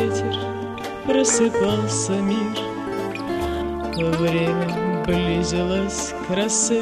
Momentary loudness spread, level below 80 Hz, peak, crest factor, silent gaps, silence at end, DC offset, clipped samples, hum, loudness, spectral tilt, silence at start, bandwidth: 9 LU; -40 dBFS; -6 dBFS; 14 dB; none; 0 s; under 0.1%; under 0.1%; none; -22 LUFS; -4.5 dB/octave; 0 s; 15 kHz